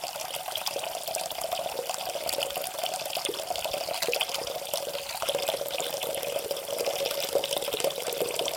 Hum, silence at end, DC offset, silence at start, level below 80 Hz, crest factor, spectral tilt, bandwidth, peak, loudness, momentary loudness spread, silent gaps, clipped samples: none; 0 s; under 0.1%; 0 s; -66 dBFS; 24 dB; -0.5 dB/octave; 17 kHz; -8 dBFS; -30 LUFS; 4 LU; none; under 0.1%